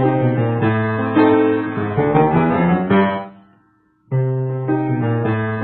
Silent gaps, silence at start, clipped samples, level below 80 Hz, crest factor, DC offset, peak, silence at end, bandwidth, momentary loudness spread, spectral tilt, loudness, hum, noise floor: none; 0 s; under 0.1%; -46 dBFS; 16 dB; under 0.1%; -2 dBFS; 0 s; 4.3 kHz; 7 LU; -12.5 dB/octave; -17 LUFS; none; -58 dBFS